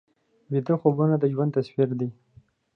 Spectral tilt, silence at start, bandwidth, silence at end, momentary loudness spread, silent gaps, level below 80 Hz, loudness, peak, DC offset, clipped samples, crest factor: -11 dB/octave; 0.5 s; 5.8 kHz; 0.65 s; 8 LU; none; -70 dBFS; -25 LUFS; -6 dBFS; under 0.1%; under 0.1%; 18 dB